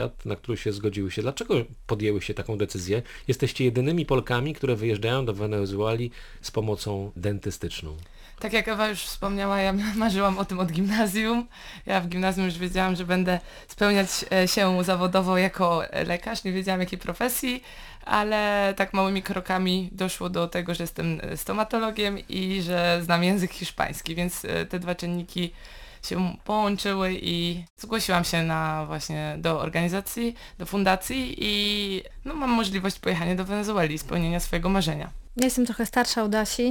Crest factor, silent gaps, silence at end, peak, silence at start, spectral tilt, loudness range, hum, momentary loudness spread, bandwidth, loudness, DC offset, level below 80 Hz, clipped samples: 20 dB; 27.70-27.77 s; 0 s; -6 dBFS; 0 s; -5 dB/octave; 4 LU; none; 8 LU; 19 kHz; -26 LUFS; under 0.1%; -44 dBFS; under 0.1%